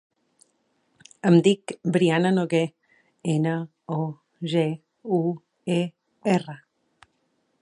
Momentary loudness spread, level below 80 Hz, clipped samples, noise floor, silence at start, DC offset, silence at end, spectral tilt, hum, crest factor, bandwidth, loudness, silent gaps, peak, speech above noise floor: 14 LU; -74 dBFS; under 0.1%; -71 dBFS; 1.25 s; under 0.1%; 1.05 s; -7 dB/octave; none; 18 dB; 11 kHz; -24 LUFS; none; -6 dBFS; 49 dB